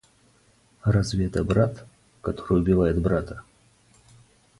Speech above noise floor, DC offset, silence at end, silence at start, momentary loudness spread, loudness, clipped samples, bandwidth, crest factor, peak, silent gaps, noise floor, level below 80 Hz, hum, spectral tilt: 38 dB; under 0.1%; 1.2 s; 0.85 s; 15 LU; -24 LUFS; under 0.1%; 11.5 kHz; 18 dB; -8 dBFS; none; -60 dBFS; -40 dBFS; none; -7.5 dB/octave